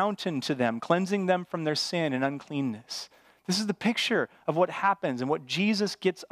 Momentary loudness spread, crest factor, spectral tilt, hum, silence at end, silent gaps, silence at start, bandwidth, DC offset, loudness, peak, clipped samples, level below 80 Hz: 7 LU; 20 dB; -4.5 dB/octave; none; 0.05 s; none; 0 s; 15.5 kHz; under 0.1%; -28 LUFS; -8 dBFS; under 0.1%; -78 dBFS